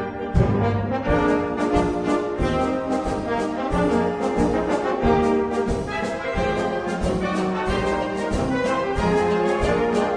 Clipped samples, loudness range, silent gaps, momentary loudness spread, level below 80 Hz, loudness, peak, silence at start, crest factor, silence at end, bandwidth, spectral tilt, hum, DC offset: under 0.1%; 1 LU; none; 4 LU; -34 dBFS; -22 LUFS; -4 dBFS; 0 s; 16 dB; 0 s; 10.5 kHz; -6.5 dB/octave; none; under 0.1%